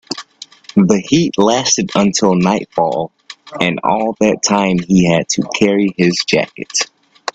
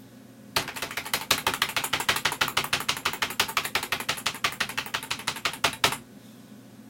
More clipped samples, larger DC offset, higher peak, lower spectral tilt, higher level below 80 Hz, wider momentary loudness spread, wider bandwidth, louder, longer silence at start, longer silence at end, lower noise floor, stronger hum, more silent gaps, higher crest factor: neither; neither; about the same, 0 dBFS vs 0 dBFS; first, -4.5 dB/octave vs -1 dB/octave; first, -48 dBFS vs -60 dBFS; first, 11 LU vs 6 LU; second, 8.6 kHz vs 17 kHz; first, -14 LUFS vs -27 LUFS; about the same, 0.1 s vs 0 s; about the same, 0.05 s vs 0 s; second, -38 dBFS vs -48 dBFS; neither; neither; second, 14 dB vs 30 dB